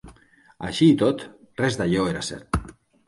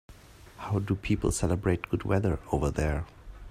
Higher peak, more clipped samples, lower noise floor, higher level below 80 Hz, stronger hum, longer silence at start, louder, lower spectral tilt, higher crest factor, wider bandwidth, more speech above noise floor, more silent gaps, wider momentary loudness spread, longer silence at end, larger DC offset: first, -6 dBFS vs -10 dBFS; neither; first, -55 dBFS vs -51 dBFS; about the same, -42 dBFS vs -40 dBFS; neither; about the same, 0.05 s vs 0.1 s; first, -23 LUFS vs -29 LUFS; about the same, -6 dB/octave vs -6.5 dB/octave; about the same, 18 dB vs 18 dB; second, 11.5 kHz vs 15.5 kHz; first, 33 dB vs 23 dB; neither; first, 14 LU vs 10 LU; first, 0.35 s vs 0 s; neither